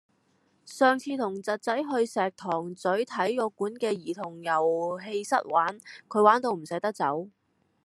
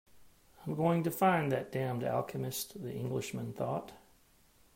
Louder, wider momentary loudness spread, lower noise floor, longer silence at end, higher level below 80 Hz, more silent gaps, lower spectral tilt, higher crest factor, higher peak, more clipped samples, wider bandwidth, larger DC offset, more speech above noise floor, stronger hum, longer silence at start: first, -28 LUFS vs -34 LUFS; about the same, 10 LU vs 11 LU; about the same, -68 dBFS vs -65 dBFS; second, 0.55 s vs 0.8 s; second, -84 dBFS vs -68 dBFS; neither; about the same, -5 dB/octave vs -6 dB/octave; about the same, 22 dB vs 18 dB; first, -6 dBFS vs -16 dBFS; neither; second, 13 kHz vs 16 kHz; neither; first, 41 dB vs 32 dB; neither; first, 0.65 s vs 0.15 s